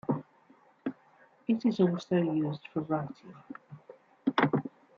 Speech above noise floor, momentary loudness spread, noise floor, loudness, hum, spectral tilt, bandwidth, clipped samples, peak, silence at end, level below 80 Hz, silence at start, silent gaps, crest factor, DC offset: 32 dB; 21 LU; -62 dBFS; -31 LUFS; none; -8 dB/octave; 7.2 kHz; under 0.1%; -10 dBFS; 0.3 s; -74 dBFS; 0.1 s; none; 22 dB; under 0.1%